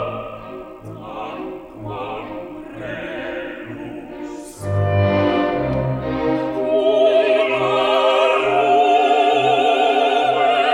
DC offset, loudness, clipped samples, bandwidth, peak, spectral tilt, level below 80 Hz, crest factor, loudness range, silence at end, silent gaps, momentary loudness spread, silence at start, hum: under 0.1%; -17 LUFS; under 0.1%; 12 kHz; -4 dBFS; -6 dB/octave; -46 dBFS; 14 dB; 14 LU; 0 s; none; 17 LU; 0 s; none